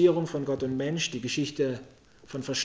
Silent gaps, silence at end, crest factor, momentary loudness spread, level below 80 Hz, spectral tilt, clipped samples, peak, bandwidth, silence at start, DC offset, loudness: none; 0 s; 18 dB; 10 LU; -62 dBFS; -4.5 dB/octave; under 0.1%; -10 dBFS; 8 kHz; 0 s; under 0.1%; -30 LUFS